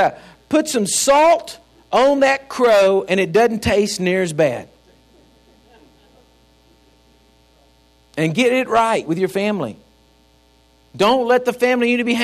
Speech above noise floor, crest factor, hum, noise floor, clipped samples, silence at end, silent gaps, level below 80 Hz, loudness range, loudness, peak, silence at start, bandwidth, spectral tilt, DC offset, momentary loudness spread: 38 dB; 16 dB; none; -54 dBFS; under 0.1%; 0 s; none; -52 dBFS; 9 LU; -16 LUFS; -2 dBFS; 0 s; 15.5 kHz; -4 dB/octave; under 0.1%; 7 LU